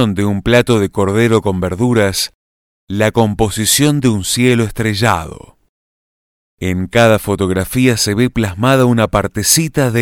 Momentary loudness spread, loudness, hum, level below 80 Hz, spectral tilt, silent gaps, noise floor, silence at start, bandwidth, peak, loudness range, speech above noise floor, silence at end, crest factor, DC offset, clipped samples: 6 LU; -13 LUFS; none; -36 dBFS; -4.5 dB/octave; 2.35-2.87 s, 5.69-6.58 s; under -90 dBFS; 0 s; 19 kHz; 0 dBFS; 3 LU; over 77 dB; 0 s; 14 dB; under 0.1%; under 0.1%